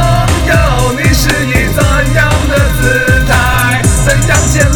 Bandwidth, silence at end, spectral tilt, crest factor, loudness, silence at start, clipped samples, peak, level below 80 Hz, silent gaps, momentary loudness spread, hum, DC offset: over 20 kHz; 0 s; -4.5 dB/octave; 8 dB; -9 LUFS; 0 s; 0.3%; 0 dBFS; -14 dBFS; none; 2 LU; none; under 0.1%